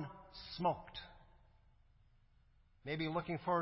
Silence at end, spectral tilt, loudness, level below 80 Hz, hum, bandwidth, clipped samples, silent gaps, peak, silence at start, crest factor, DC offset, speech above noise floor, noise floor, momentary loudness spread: 0 s; -4.5 dB/octave; -41 LUFS; -66 dBFS; none; 5.6 kHz; under 0.1%; none; -24 dBFS; 0 s; 20 dB; under 0.1%; 30 dB; -69 dBFS; 15 LU